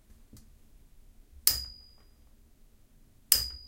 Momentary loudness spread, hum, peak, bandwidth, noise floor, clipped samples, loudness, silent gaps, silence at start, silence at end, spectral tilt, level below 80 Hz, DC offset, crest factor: 20 LU; none; 0 dBFS; 16.5 kHz; -59 dBFS; under 0.1%; -27 LUFS; none; 0.35 s; 0.05 s; 0.5 dB/octave; -52 dBFS; under 0.1%; 36 dB